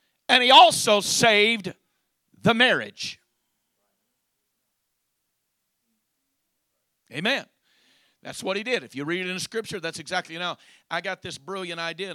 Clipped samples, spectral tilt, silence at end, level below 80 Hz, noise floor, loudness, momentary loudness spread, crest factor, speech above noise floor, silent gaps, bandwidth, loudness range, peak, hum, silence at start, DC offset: under 0.1%; -2.5 dB/octave; 0 s; -68 dBFS; -77 dBFS; -21 LUFS; 19 LU; 24 dB; 54 dB; none; 16 kHz; 15 LU; -2 dBFS; none; 0.3 s; under 0.1%